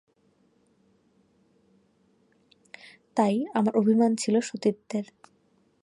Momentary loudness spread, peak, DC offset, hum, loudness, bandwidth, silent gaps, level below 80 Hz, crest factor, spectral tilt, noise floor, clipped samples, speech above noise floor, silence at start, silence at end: 24 LU; -10 dBFS; under 0.1%; none; -26 LUFS; 11.5 kHz; none; -76 dBFS; 20 dB; -6 dB/octave; -66 dBFS; under 0.1%; 42 dB; 3.15 s; 0.8 s